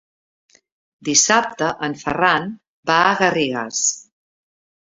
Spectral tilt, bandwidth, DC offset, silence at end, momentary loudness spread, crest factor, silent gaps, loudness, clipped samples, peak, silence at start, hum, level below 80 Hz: -2 dB/octave; 7.8 kHz; under 0.1%; 0.95 s; 14 LU; 20 dB; 2.67-2.83 s; -17 LUFS; under 0.1%; -2 dBFS; 1 s; none; -58 dBFS